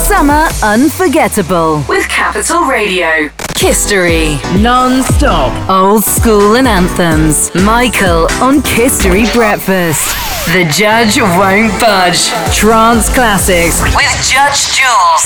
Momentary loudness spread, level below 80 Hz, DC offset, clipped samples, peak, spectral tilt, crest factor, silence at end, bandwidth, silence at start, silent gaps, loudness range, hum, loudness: 4 LU; -20 dBFS; 1%; under 0.1%; 0 dBFS; -3.5 dB/octave; 8 dB; 0 s; over 20 kHz; 0 s; none; 2 LU; none; -8 LUFS